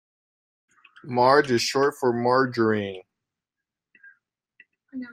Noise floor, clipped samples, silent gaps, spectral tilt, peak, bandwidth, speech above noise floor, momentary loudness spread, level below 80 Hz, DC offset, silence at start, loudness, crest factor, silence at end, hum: -88 dBFS; under 0.1%; none; -5 dB/octave; -4 dBFS; 15.5 kHz; 66 dB; 19 LU; -68 dBFS; under 0.1%; 1.05 s; -22 LUFS; 22 dB; 0 s; none